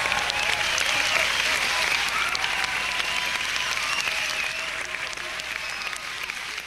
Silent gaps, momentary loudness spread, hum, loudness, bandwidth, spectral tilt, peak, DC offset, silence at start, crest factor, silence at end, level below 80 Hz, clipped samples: none; 9 LU; none; -24 LUFS; 16 kHz; 0.5 dB/octave; -2 dBFS; under 0.1%; 0 s; 24 dB; 0 s; -52 dBFS; under 0.1%